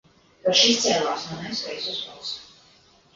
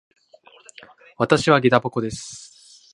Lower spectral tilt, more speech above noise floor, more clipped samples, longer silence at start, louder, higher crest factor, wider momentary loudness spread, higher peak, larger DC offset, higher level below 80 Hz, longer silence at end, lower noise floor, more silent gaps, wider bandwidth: second, -2 dB/octave vs -5 dB/octave; about the same, 32 dB vs 33 dB; neither; second, 0.45 s vs 1.2 s; second, -22 LUFS vs -19 LUFS; about the same, 20 dB vs 22 dB; second, 16 LU vs 19 LU; second, -4 dBFS vs 0 dBFS; neither; second, -64 dBFS vs -56 dBFS; first, 0.7 s vs 0.55 s; first, -56 dBFS vs -52 dBFS; neither; second, 7.6 kHz vs 11.5 kHz